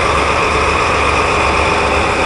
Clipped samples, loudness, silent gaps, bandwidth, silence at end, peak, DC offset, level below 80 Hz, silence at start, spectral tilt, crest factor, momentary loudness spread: under 0.1%; -12 LUFS; none; 11.5 kHz; 0 s; 0 dBFS; under 0.1%; -24 dBFS; 0 s; -4 dB/octave; 12 dB; 1 LU